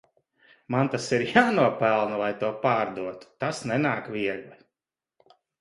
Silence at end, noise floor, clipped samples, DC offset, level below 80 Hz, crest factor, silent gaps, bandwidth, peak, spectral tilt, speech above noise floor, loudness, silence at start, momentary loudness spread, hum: 1.05 s; under -90 dBFS; under 0.1%; under 0.1%; -66 dBFS; 22 dB; none; 11.5 kHz; -6 dBFS; -5.5 dB/octave; over 65 dB; -25 LUFS; 0.7 s; 11 LU; none